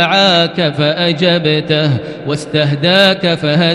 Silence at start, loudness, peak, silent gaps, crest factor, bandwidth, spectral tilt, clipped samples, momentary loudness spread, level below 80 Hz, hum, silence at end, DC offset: 0 s; -12 LUFS; 0 dBFS; none; 12 dB; 12.5 kHz; -5.5 dB/octave; under 0.1%; 7 LU; -50 dBFS; none; 0 s; under 0.1%